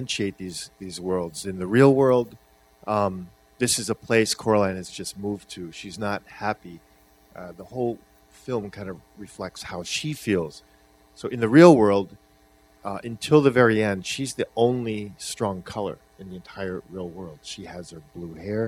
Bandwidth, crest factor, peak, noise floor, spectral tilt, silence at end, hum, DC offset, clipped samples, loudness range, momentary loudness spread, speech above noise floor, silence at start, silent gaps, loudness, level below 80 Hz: 15.5 kHz; 24 dB; 0 dBFS; -57 dBFS; -5 dB/octave; 0 s; 50 Hz at -55 dBFS; under 0.1%; under 0.1%; 13 LU; 21 LU; 34 dB; 0 s; none; -23 LUFS; -58 dBFS